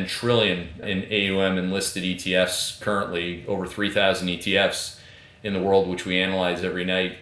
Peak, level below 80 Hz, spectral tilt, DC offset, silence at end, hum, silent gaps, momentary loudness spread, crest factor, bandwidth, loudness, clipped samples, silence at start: -6 dBFS; -54 dBFS; -4 dB/octave; under 0.1%; 0 s; none; none; 8 LU; 18 dB; 11 kHz; -23 LUFS; under 0.1%; 0 s